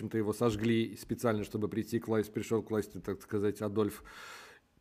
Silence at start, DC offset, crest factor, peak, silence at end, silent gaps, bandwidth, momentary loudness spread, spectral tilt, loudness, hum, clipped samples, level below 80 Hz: 0 s; under 0.1%; 20 dB; -14 dBFS; 0.25 s; none; 15.5 kHz; 14 LU; -6.5 dB/octave; -34 LUFS; none; under 0.1%; -62 dBFS